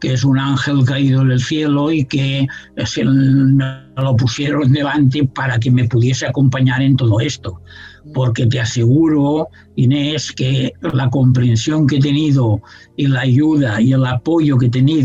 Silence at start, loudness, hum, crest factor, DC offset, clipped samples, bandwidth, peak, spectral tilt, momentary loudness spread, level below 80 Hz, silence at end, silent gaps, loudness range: 0 s; -15 LUFS; none; 12 dB; under 0.1%; under 0.1%; 7.8 kHz; -2 dBFS; -6.5 dB/octave; 7 LU; -46 dBFS; 0 s; none; 2 LU